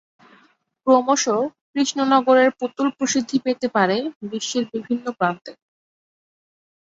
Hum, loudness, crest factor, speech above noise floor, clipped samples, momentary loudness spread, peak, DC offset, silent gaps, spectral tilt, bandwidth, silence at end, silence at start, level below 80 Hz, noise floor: none; -20 LUFS; 18 dB; 39 dB; under 0.1%; 10 LU; -4 dBFS; under 0.1%; 1.61-1.74 s, 4.16-4.21 s; -3.5 dB/octave; 7.8 kHz; 1.4 s; 0.85 s; -68 dBFS; -59 dBFS